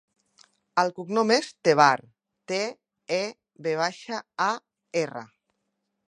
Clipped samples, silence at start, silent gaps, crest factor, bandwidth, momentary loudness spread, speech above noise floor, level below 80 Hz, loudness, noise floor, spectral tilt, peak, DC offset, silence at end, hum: under 0.1%; 0.75 s; none; 24 dB; 11 kHz; 15 LU; 54 dB; -82 dBFS; -26 LUFS; -79 dBFS; -4 dB/octave; -2 dBFS; under 0.1%; 0.85 s; none